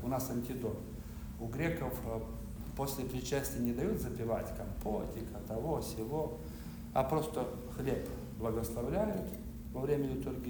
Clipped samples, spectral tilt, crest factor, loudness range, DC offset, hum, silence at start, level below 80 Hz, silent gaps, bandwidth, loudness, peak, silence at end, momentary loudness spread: under 0.1%; -6.5 dB/octave; 18 dB; 2 LU; under 0.1%; none; 0 s; -48 dBFS; none; over 20 kHz; -38 LUFS; -18 dBFS; 0 s; 9 LU